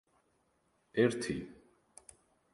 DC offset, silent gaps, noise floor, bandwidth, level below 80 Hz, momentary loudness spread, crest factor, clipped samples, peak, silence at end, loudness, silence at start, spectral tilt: under 0.1%; none; -75 dBFS; 11.5 kHz; -66 dBFS; 25 LU; 22 dB; under 0.1%; -16 dBFS; 1 s; -34 LUFS; 0.95 s; -5.5 dB/octave